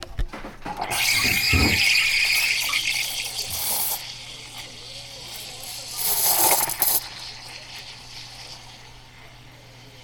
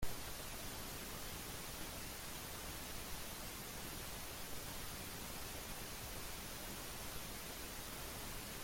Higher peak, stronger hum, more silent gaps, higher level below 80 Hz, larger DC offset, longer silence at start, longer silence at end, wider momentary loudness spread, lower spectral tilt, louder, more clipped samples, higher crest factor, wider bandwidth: first, -4 dBFS vs -28 dBFS; neither; neither; first, -40 dBFS vs -56 dBFS; neither; about the same, 0 s vs 0 s; about the same, 0 s vs 0 s; first, 20 LU vs 0 LU; second, -1 dB/octave vs -2.5 dB/octave; first, -20 LUFS vs -47 LUFS; neither; about the same, 22 dB vs 18 dB; first, over 20 kHz vs 16.5 kHz